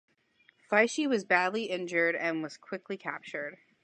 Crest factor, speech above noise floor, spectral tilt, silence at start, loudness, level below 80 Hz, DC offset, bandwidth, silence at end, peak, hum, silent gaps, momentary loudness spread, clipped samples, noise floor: 22 dB; 37 dB; -4 dB/octave; 0.7 s; -30 LUFS; -86 dBFS; under 0.1%; 10 kHz; 0.3 s; -10 dBFS; none; none; 13 LU; under 0.1%; -67 dBFS